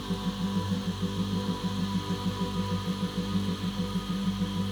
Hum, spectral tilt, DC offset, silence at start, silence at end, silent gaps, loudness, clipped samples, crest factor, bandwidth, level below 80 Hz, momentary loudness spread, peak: none; -6 dB/octave; under 0.1%; 0 s; 0 s; none; -31 LUFS; under 0.1%; 14 dB; over 20 kHz; -48 dBFS; 2 LU; -16 dBFS